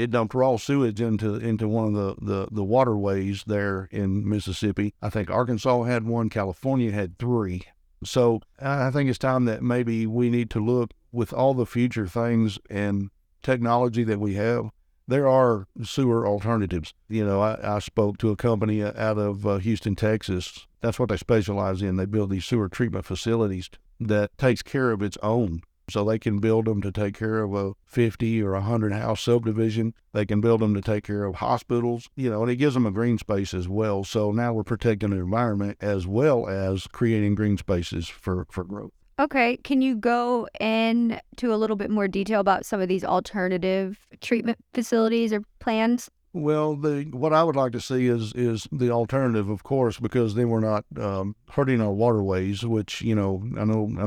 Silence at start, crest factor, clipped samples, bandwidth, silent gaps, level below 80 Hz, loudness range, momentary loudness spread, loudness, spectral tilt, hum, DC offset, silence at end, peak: 0 s; 18 dB; under 0.1%; 13.5 kHz; none; -52 dBFS; 2 LU; 7 LU; -25 LUFS; -7 dB/octave; none; under 0.1%; 0 s; -6 dBFS